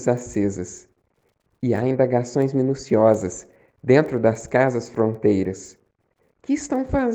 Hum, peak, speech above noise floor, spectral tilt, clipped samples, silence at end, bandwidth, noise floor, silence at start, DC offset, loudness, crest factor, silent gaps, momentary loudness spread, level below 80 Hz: none; -2 dBFS; 47 dB; -7 dB/octave; under 0.1%; 0 s; 9.2 kHz; -68 dBFS; 0 s; under 0.1%; -21 LUFS; 20 dB; none; 14 LU; -48 dBFS